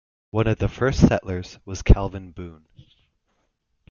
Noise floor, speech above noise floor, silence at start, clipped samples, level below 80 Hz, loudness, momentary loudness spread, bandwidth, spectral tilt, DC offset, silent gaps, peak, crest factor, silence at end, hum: -71 dBFS; 50 dB; 0.35 s; under 0.1%; -28 dBFS; -22 LUFS; 19 LU; 7.2 kHz; -7 dB/octave; under 0.1%; none; -2 dBFS; 22 dB; 1.4 s; none